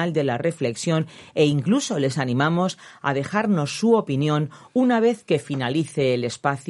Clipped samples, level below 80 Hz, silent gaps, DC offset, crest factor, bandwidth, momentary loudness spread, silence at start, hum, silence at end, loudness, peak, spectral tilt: under 0.1%; -64 dBFS; none; under 0.1%; 18 dB; 11.5 kHz; 6 LU; 0 s; none; 0.1 s; -22 LUFS; -4 dBFS; -6 dB/octave